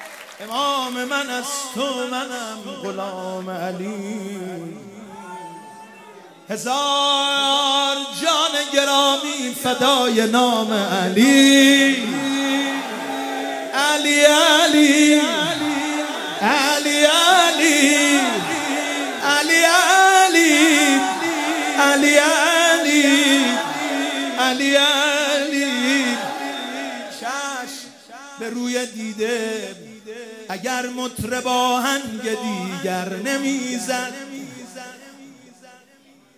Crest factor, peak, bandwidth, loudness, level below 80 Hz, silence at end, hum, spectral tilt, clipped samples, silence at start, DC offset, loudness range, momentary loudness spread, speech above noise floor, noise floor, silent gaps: 18 dB; 0 dBFS; 16 kHz; -17 LUFS; -64 dBFS; 1.05 s; none; -2 dB/octave; under 0.1%; 0 s; under 0.1%; 12 LU; 17 LU; 34 dB; -52 dBFS; none